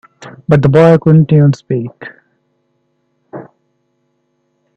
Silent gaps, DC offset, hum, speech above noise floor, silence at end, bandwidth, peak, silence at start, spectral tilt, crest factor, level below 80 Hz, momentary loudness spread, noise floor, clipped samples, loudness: none; under 0.1%; none; 54 dB; 1.35 s; 7.2 kHz; 0 dBFS; 0.2 s; -9.5 dB/octave; 14 dB; -48 dBFS; 25 LU; -63 dBFS; under 0.1%; -10 LUFS